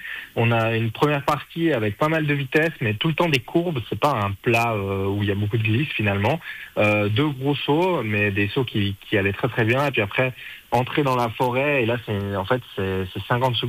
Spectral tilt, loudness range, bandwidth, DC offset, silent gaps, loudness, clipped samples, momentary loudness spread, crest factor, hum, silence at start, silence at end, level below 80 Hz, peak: -6.5 dB/octave; 1 LU; 15.5 kHz; under 0.1%; none; -22 LUFS; under 0.1%; 5 LU; 16 dB; none; 0 s; 0 s; -54 dBFS; -6 dBFS